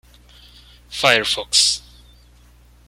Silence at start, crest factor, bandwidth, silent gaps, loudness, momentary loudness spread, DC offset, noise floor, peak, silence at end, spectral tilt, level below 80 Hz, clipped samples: 0.9 s; 22 dB; 16.5 kHz; none; -16 LUFS; 11 LU; under 0.1%; -49 dBFS; 0 dBFS; 1.1 s; -0.5 dB/octave; -48 dBFS; under 0.1%